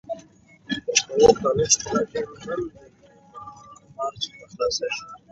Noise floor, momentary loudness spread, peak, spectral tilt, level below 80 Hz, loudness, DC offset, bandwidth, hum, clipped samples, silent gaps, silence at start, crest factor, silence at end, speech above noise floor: -52 dBFS; 20 LU; -2 dBFS; -2.5 dB/octave; -52 dBFS; -23 LUFS; under 0.1%; 8 kHz; none; under 0.1%; none; 0.1 s; 24 dB; 0.15 s; 29 dB